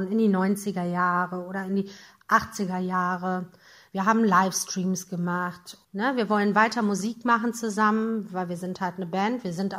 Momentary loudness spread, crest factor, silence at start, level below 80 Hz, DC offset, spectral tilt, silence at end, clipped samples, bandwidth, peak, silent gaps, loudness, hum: 10 LU; 20 dB; 0 s; -68 dBFS; under 0.1%; -5 dB/octave; 0 s; under 0.1%; 16 kHz; -6 dBFS; none; -26 LUFS; none